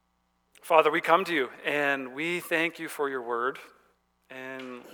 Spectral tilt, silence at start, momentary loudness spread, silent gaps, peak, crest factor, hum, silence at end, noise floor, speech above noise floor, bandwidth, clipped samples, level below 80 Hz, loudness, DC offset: -4 dB/octave; 0.65 s; 17 LU; none; -4 dBFS; 26 dB; none; 0 s; -73 dBFS; 46 dB; over 20 kHz; under 0.1%; -80 dBFS; -27 LUFS; under 0.1%